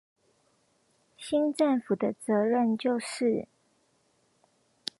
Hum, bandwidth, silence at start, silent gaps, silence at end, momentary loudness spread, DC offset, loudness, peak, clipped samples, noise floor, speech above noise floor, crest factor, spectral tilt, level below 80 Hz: none; 11.5 kHz; 1.2 s; none; 1.55 s; 14 LU; under 0.1%; -28 LUFS; -12 dBFS; under 0.1%; -70 dBFS; 43 dB; 20 dB; -5.5 dB/octave; -76 dBFS